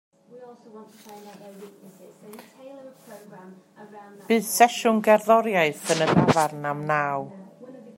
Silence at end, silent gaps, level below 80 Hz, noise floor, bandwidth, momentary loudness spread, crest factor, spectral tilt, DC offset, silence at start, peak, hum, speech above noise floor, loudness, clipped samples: 0.05 s; none; -66 dBFS; -47 dBFS; 16 kHz; 26 LU; 24 dB; -4.5 dB/octave; under 0.1%; 0.35 s; -2 dBFS; none; 22 dB; -21 LUFS; under 0.1%